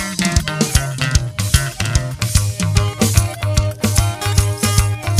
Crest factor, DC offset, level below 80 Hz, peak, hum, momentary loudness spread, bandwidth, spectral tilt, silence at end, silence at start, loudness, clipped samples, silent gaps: 16 dB; under 0.1%; -24 dBFS; 0 dBFS; none; 3 LU; 16 kHz; -4 dB/octave; 0 s; 0 s; -17 LUFS; under 0.1%; none